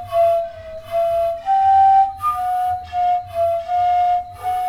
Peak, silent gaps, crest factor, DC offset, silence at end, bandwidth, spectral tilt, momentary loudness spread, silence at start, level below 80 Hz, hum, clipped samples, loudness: -6 dBFS; none; 10 dB; under 0.1%; 0 s; 14.5 kHz; -4.5 dB/octave; 9 LU; 0 s; -48 dBFS; none; under 0.1%; -18 LUFS